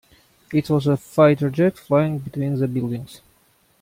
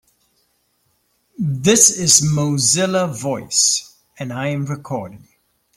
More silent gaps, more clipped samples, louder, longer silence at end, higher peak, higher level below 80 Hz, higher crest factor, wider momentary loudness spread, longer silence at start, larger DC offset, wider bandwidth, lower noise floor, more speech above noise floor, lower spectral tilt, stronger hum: neither; neither; second, -20 LUFS vs -15 LUFS; about the same, 0.65 s vs 0.6 s; about the same, -2 dBFS vs 0 dBFS; about the same, -56 dBFS vs -56 dBFS; about the same, 18 dB vs 20 dB; second, 10 LU vs 17 LU; second, 0.5 s vs 1.4 s; neither; about the same, 16 kHz vs 16.5 kHz; second, -60 dBFS vs -65 dBFS; second, 40 dB vs 47 dB; first, -8 dB/octave vs -3 dB/octave; neither